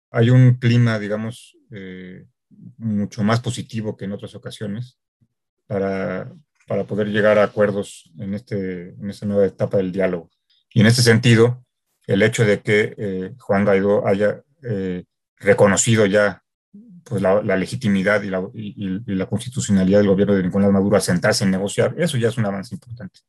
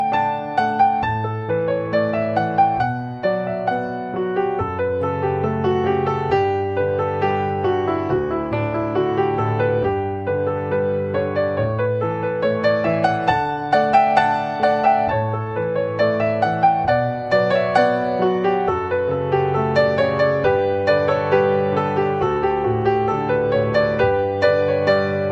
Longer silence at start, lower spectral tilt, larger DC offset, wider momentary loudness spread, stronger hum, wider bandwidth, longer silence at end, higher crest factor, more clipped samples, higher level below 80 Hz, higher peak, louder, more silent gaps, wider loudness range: first, 0.15 s vs 0 s; second, -6 dB/octave vs -8 dB/octave; neither; first, 17 LU vs 5 LU; neither; first, 12.5 kHz vs 8.4 kHz; first, 0.2 s vs 0 s; about the same, 18 dB vs 16 dB; neither; second, -60 dBFS vs -48 dBFS; about the same, -2 dBFS vs -2 dBFS; about the same, -19 LUFS vs -19 LUFS; first, 5.08-5.20 s, 5.49-5.57 s, 15.28-15.36 s, 16.54-16.72 s vs none; first, 9 LU vs 3 LU